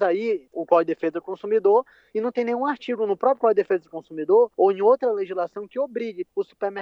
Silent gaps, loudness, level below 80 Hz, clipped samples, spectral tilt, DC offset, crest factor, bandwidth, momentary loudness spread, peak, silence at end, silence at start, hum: none; -23 LUFS; -76 dBFS; under 0.1%; -7.5 dB/octave; under 0.1%; 18 dB; 6.2 kHz; 10 LU; -4 dBFS; 0 s; 0 s; none